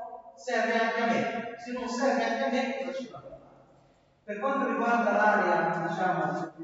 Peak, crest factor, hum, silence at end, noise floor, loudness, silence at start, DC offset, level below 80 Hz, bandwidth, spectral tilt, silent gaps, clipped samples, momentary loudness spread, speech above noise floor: -10 dBFS; 18 dB; none; 0 s; -62 dBFS; -28 LUFS; 0 s; under 0.1%; -72 dBFS; 8 kHz; -5 dB/octave; none; under 0.1%; 14 LU; 34 dB